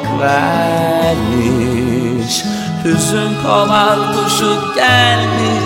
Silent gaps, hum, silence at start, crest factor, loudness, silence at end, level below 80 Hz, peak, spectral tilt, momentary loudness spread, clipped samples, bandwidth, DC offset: none; none; 0 s; 14 dB; -13 LUFS; 0 s; -38 dBFS; 0 dBFS; -4.5 dB/octave; 6 LU; under 0.1%; 16.5 kHz; under 0.1%